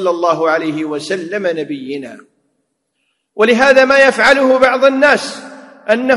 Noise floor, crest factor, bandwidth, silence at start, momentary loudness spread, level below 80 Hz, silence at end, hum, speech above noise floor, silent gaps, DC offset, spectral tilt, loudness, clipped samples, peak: -67 dBFS; 14 dB; 12 kHz; 0 s; 17 LU; -54 dBFS; 0 s; none; 55 dB; none; under 0.1%; -4 dB/octave; -12 LUFS; under 0.1%; 0 dBFS